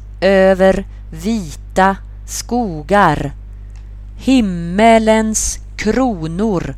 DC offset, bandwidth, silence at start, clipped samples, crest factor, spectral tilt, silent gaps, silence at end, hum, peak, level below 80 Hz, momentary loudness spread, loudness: under 0.1%; 14.5 kHz; 0 s; under 0.1%; 14 dB; -5 dB/octave; none; 0 s; 50 Hz at -30 dBFS; 0 dBFS; -30 dBFS; 19 LU; -14 LUFS